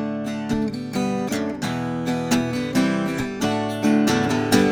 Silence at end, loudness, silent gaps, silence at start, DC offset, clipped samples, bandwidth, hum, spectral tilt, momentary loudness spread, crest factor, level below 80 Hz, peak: 0 s; -22 LUFS; none; 0 s; under 0.1%; under 0.1%; over 20 kHz; none; -5 dB/octave; 7 LU; 20 dB; -50 dBFS; -2 dBFS